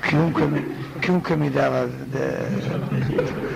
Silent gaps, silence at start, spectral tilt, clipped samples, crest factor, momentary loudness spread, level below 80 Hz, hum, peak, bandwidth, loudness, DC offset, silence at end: none; 0 s; -7.5 dB/octave; under 0.1%; 16 dB; 6 LU; -48 dBFS; none; -6 dBFS; 15.5 kHz; -23 LUFS; under 0.1%; 0 s